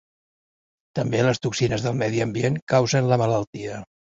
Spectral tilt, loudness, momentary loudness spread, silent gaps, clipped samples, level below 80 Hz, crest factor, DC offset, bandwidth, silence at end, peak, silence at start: -6 dB/octave; -23 LUFS; 13 LU; 2.62-2.67 s, 3.47-3.53 s; under 0.1%; -54 dBFS; 20 dB; under 0.1%; 7.8 kHz; 0.3 s; -4 dBFS; 0.95 s